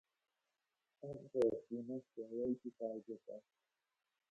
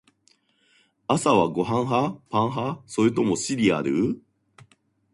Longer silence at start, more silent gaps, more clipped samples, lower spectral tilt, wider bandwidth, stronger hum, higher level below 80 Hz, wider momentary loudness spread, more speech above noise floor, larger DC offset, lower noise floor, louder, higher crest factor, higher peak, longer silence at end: about the same, 1 s vs 1.1 s; neither; neither; first, -8.5 dB/octave vs -5.5 dB/octave; second, 8.4 kHz vs 11.5 kHz; neither; second, -82 dBFS vs -60 dBFS; first, 16 LU vs 8 LU; first, 47 dB vs 42 dB; neither; first, -90 dBFS vs -64 dBFS; second, -43 LUFS vs -24 LUFS; about the same, 20 dB vs 20 dB; second, -24 dBFS vs -4 dBFS; about the same, 0.9 s vs 0.95 s